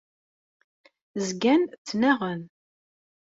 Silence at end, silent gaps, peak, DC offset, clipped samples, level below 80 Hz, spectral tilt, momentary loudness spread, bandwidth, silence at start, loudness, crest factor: 0.75 s; 1.78-1.85 s; -8 dBFS; under 0.1%; under 0.1%; -70 dBFS; -5 dB/octave; 13 LU; 8 kHz; 1.15 s; -25 LUFS; 20 dB